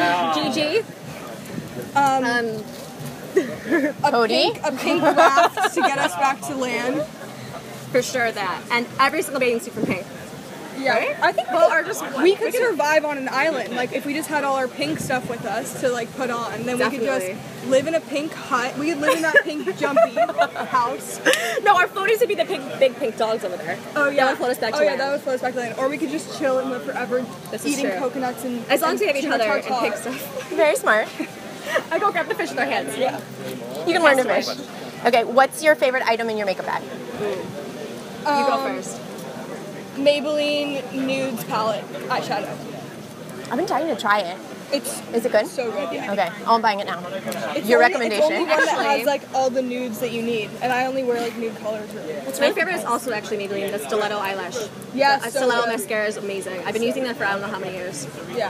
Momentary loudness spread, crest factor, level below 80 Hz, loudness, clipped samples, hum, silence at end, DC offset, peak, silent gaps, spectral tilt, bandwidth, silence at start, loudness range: 13 LU; 22 dB; -66 dBFS; -21 LUFS; under 0.1%; none; 0 s; under 0.1%; 0 dBFS; none; -3.5 dB/octave; 15.5 kHz; 0 s; 5 LU